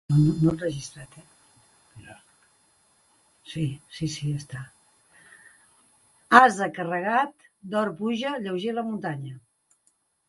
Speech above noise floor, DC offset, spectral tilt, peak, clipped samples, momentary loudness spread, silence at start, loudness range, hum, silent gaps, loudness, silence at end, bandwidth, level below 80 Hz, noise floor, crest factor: 45 dB; under 0.1%; -6 dB/octave; 0 dBFS; under 0.1%; 22 LU; 0.1 s; 14 LU; none; none; -25 LUFS; 0.9 s; 11.5 kHz; -58 dBFS; -69 dBFS; 26 dB